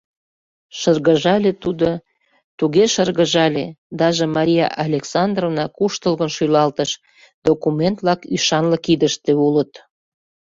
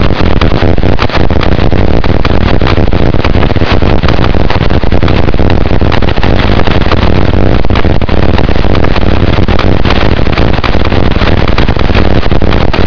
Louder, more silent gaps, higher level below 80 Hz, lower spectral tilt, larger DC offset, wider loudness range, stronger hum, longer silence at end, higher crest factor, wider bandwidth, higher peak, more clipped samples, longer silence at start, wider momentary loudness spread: second, -18 LUFS vs -9 LUFS; first, 2.44-2.58 s, 3.78-3.90 s, 7.34-7.42 s vs none; second, -54 dBFS vs -12 dBFS; second, -5 dB/octave vs -7.5 dB/octave; second, under 0.1% vs 40%; about the same, 2 LU vs 0 LU; neither; first, 0.75 s vs 0 s; first, 16 dB vs 10 dB; first, 7.8 kHz vs 5.4 kHz; about the same, -2 dBFS vs 0 dBFS; second, under 0.1% vs 2%; first, 0.75 s vs 0 s; first, 8 LU vs 1 LU